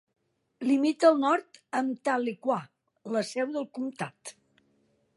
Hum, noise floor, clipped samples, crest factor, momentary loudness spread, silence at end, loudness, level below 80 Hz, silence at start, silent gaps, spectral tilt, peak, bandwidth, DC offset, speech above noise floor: none; -70 dBFS; under 0.1%; 20 dB; 15 LU; 0.85 s; -28 LUFS; -86 dBFS; 0.6 s; none; -5 dB/octave; -8 dBFS; 11.5 kHz; under 0.1%; 42 dB